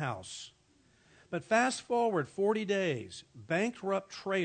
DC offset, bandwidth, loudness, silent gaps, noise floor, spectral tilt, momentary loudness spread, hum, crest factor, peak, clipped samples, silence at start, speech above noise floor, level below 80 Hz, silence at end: under 0.1%; 9.4 kHz; -32 LUFS; none; -67 dBFS; -4.5 dB/octave; 16 LU; none; 20 dB; -14 dBFS; under 0.1%; 0 s; 34 dB; -76 dBFS; 0 s